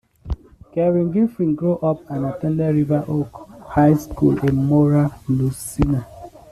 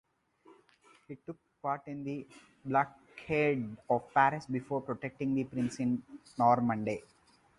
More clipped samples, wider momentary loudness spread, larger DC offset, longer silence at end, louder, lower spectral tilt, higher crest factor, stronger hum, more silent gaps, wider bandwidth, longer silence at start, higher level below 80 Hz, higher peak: neither; second, 15 LU vs 19 LU; neither; second, 0.15 s vs 0.6 s; first, -19 LUFS vs -33 LUFS; first, -8.5 dB/octave vs -7 dB/octave; second, 16 dB vs 22 dB; neither; neither; first, 13.5 kHz vs 11.5 kHz; second, 0.25 s vs 1.1 s; first, -38 dBFS vs -68 dBFS; first, -4 dBFS vs -12 dBFS